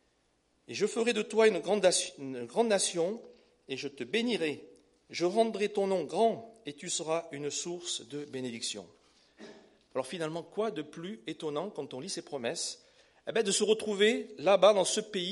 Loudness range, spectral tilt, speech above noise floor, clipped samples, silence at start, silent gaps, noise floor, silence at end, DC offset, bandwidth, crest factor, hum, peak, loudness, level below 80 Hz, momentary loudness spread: 9 LU; -3 dB/octave; 42 dB; under 0.1%; 0.7 s; none; -73 dBFS; 0 s; under 0.1%; 11.5 kHz; 20 dB; none; -10 dBFS; -31 LUFS; -80 dBFS; 15 LU